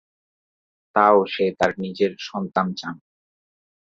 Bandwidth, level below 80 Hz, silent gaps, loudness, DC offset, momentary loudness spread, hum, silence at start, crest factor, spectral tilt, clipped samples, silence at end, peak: 7.8 kHz; -64 dBFS; none; -21 LUFS; under 0.1%; 15 LU; none; 0.95 s; 22 dB; -6 dB/octave; under 0.1%; 0.9 s; -2 dBFS